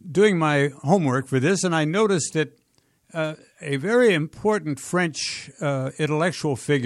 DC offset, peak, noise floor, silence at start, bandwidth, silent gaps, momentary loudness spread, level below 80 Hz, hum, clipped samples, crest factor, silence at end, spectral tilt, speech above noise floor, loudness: under 0.1%; -6 dBFS; -64 dBFS; 0.05 s; 13 kHz; none; 10 LU; -64 dBFS; none; under 0.1%; 16 dB; 0 s; -5 dB/octave; 42 dB; -22 LUFS